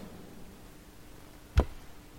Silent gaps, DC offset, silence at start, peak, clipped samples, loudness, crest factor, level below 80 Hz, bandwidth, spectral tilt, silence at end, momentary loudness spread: none; under 0.1%; 0 s; -12 dBFS; under 0.1%; -33 LUFS; 26 dB; -38 dBFS; 16.5 kHz; -6.5 dB/octave; 0 s; 21 LU